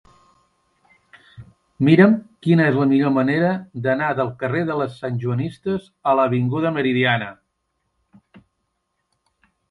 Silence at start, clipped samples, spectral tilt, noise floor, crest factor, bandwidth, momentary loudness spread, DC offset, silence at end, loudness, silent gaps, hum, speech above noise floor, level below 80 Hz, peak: 1.4 s; under 0.1%; -8.5 dB/octave; -74 dBFS; 20 dB; 11 kHz; 9 LU; under 0.1%; 2.35 s; -19 LUFS; none; none; 55 dB; -60 dBFS; 0 dBFS